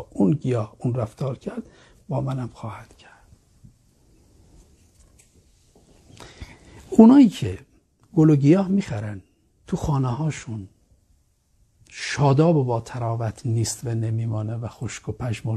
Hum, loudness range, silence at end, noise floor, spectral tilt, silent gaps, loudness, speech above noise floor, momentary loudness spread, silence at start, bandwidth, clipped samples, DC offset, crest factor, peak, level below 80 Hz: none; 15 LU; 0 s; -63 dBFS; -7.5 dB/octave; none; -22 LUFS; 42 dB; 21 LU; 0 s; 13 kHz; under 0.1%; under 0.1%; 22 dB; 0 dBFS; -50 dBFS